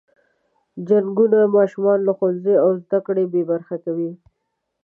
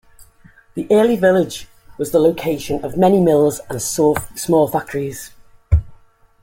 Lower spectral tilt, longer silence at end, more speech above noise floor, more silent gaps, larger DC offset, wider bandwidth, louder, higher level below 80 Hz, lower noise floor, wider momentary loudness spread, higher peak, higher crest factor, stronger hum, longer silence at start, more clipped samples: first, -10.5 dB/octave vs -6 dB/octave; first, 0.7 s vs 0.5 s; first, 58 dB vs 32 dB; neither; neither; second, 3.2 kHz vs 17 kHz; about the same, -19 LUFS vs -17 LUFS; second, -74 dBFS vs -34 dBFS; first, -75 dBFS vs -48 dBFS; second, 11 LU vs 14 LU; about the same, -4 dBFS vs -2 dBFS; about the same, 14 dB vs 16 dB; neither; about the same, 0.75 s vs 0.75 s; neither